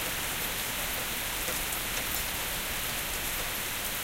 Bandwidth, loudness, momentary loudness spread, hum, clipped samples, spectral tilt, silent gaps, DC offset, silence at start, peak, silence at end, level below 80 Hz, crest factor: 16.5 kHz; -30 LUFS; 1 LU; none; under 0.1%; -1 dB/octave; none; under 0.1%; 0 s; -12 dBFS; 0 s; -46 dBFS; 20 dB